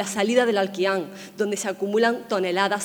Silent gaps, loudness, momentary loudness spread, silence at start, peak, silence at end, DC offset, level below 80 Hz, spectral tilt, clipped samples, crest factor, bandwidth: none; -23 LUFS; 7 LU; 0 s; -6 dBFS; 0 s; under 0.1%; -72 dBFS; -3.5 dB/octave; under 0.1%; 16 dB; over 20 kHz